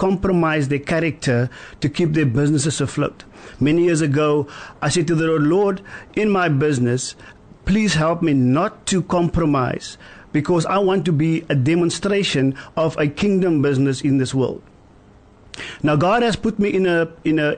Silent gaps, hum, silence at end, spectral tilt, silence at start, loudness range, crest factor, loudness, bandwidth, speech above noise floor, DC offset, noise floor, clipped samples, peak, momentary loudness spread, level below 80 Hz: none; none; 0 s; -6 dB/octave; 0 s; 2 LU; 10 dB; -19 LUFS; 9.6 kHz; 29 dB; under 0.1%; -48 dBFS; under 0.1%; -10 dBFS; 8 LU; -42 dBFS